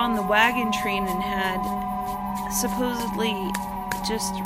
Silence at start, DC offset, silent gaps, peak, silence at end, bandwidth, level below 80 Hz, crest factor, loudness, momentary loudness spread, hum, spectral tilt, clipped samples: 0 s; under 0.1%; none; -4 dBFS; 0 s; 16 kHz; -44 dBFS; 20 dB; -25 LUFS; 10 LU; none; -3.5 dB/octave; under 0.1%